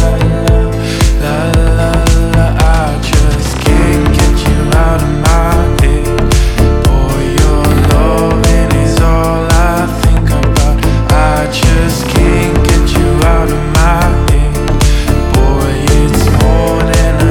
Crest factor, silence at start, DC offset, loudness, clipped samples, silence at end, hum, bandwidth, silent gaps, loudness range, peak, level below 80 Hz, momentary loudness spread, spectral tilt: 8 dB; 0 s; under 0.1%; -10 LUFS; under 0.1%; 0 s; none; 17.5 kHz; none; 1 LU; 0 dBFS; -12 dBFS; 2 LU; -5.5 dB/octave